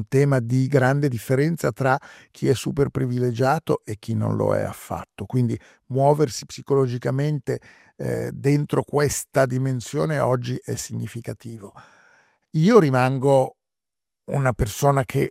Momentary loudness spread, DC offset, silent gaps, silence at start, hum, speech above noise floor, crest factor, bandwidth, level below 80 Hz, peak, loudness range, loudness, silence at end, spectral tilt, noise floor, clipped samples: 12 LU; under 0.1%; none; 0 s; none; 67 dB; 20 dB; 16 kHz; -48 dBFS; -2 dBFS; 3 LU; -22 LUFS; 0 s; -6.5 dB/octave; -89 dBFS; under 0.1%